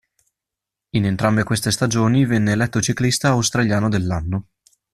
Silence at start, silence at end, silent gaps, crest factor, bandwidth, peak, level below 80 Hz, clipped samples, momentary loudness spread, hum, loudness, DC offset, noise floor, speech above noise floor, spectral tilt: 0.95 s; 0.5 s; none; 18 dB; 14 kHz; 0 dBFS; -44 dBFS; under 0.1%; 6 LU; none; -19 LUFS; under 0.1%; -85 dBFS; 67 dB; -5 dB/octave